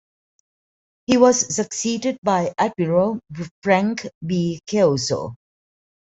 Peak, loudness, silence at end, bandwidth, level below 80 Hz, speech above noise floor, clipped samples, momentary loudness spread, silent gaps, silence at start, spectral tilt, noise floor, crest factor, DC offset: -2 dBFS; -20 LUFS; 0.65 s; 8.4 kHz; -60 dBFS; over 70 dB; under 0.1%; 13 LU; 2.18-2.22 s, 3.51-3.62 s, 4.15-4.21 s; 1.1 s; -4.5 dB/octave; under -90 dBFS; 20 dB; under 0.1%